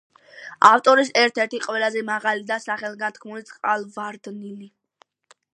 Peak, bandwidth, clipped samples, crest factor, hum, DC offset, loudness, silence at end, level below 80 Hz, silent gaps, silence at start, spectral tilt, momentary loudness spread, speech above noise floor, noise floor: 0 dBFS; 11 kHz; under 0.1%; 22 dB; none; under 0.1%; -20 LUFS; 0.85 s; -78 dBFS; none; 0.35 s; -2.5 dB/octave; 22 LU; 40 dB; -61 dBFS